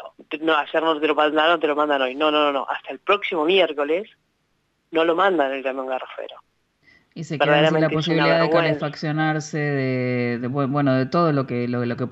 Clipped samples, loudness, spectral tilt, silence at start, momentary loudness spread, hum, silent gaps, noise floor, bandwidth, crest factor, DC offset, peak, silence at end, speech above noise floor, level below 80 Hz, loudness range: under 0.1%; -21 LUFS; -6.5 dB/octave; 0 s; 10 LU; none; none; -69 dBFS; 8 kHz; 16 dB; under 0.1%; -6 dBFS; 0 s; 48 dB; -68 dBFS; 4 LU